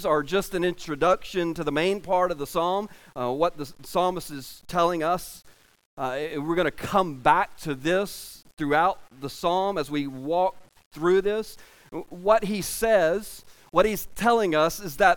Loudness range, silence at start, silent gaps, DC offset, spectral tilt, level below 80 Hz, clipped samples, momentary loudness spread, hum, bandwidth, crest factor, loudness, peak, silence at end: 3 LU; 0 s; 5.85-5.97 s, 10.86-10.91 s; under 0.1%; -4.5 dB/octave; -50 dBFS; under 0.1%; 14 LU; none; 17.5 kHz; 20 dB; -25 LUFS; -4 dBFS; 0 s